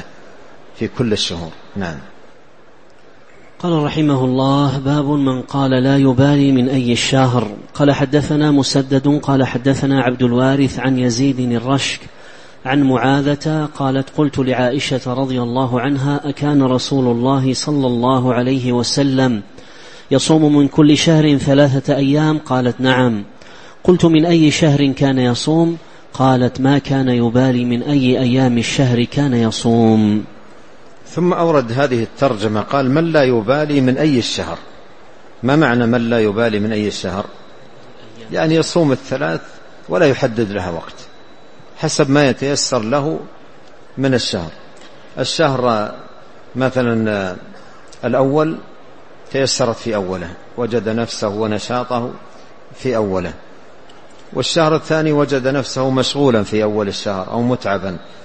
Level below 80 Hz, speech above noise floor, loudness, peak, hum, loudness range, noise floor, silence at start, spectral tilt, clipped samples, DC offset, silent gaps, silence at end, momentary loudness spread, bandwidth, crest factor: -46 dBFS; 32 dB; -15 LUFS; 0 dBFS; none; 6 LU; -46 dBFS; 0 s; -6 dB/octave; under 0.1%; 1%; none; 0 s; 11 LU; 8.8 kHz; 16 dB